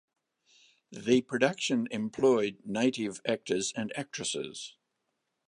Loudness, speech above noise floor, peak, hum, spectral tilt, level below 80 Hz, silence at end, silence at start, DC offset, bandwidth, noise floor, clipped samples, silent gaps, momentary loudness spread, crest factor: -30 LUFS; 52 dB; -8 dBFS; none; -4 dB/octave; -72 dBFS; 0.8 s; 0.9 s; under 0.1%; 11 kHz; -82 dBFS; under 0.1%; none; 13 LU; 22 dB